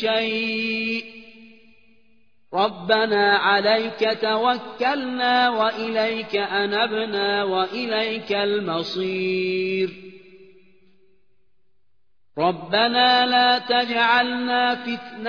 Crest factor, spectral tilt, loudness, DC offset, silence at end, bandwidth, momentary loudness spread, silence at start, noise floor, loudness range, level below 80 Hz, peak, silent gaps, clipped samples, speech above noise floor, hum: 18 dB; -5.5 dB/octave; -21 LUFS; 0.2%; 0 s; 5.4 kHz; 8 LU; 0 s; -75 dBFS; 8 LU; -70 dBFS; -4 dBFS; none; under 0.1%; 53 dB; none